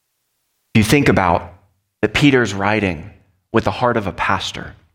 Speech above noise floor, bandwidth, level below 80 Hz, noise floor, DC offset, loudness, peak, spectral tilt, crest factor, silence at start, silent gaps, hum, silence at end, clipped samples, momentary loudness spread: 53 dB; 17 kHz; -40 dBFS; -70 dBFS; under 0.1%; -17 LUFS; 0 dBFS; -5.5 dB/octave; 18 dB; 0.75 s; none; none; 0.25 s; under 0.1%; 9 LU